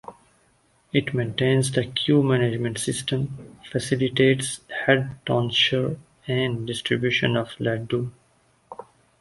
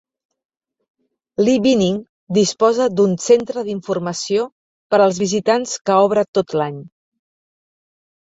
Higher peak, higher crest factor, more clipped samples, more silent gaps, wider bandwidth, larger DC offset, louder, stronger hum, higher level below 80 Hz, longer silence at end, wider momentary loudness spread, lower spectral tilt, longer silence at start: about the same, -4 dBFS vs -2 dBFS; about the same, 20 dB vs 16 dB; neither; second, none vs 2.09-2.27 s, 4.52-4.90 s, 5.81-5.85 s, 6.28-6.33 s; first, 11.5 kHz vs 8 kHz; neither; second, -23 LUFS vs -17 LUFS; neither; about the same, -56 dBFS vs -60 dBFS; second, 0.4 s vs 1.4 s; about the same, 12 LU vs 10 LU; about the same, -5 dB/octave vs -5 dB/octave; second, 0.1 s vs 1.4 s